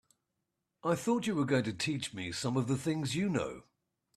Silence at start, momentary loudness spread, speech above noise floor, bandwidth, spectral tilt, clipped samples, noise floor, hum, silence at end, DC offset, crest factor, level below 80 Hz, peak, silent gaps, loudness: 0.85 s; 7 LU; 52 dB; 13.5 kHz; -5.5 dB/octave; under 0.1%; -85 dBFS; none; 0.55 s; under 0.1%; 18 dB; -68 dBFS; -18 dBFS; none; -33 LUFS